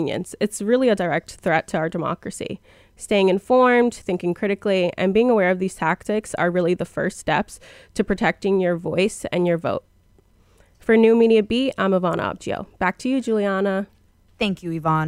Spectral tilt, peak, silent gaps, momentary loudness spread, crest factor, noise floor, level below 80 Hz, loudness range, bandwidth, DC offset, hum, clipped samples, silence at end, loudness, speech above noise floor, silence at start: -6 dB/octave; -4 dBFS; none; 12 LU; 18 dB; -56 dBFS; -52 dBFS; 4 LU; 14.5 kHz; under 0.1%; none; under 0.1%; 0 s; -21 LUFS; 36 dB; 0 s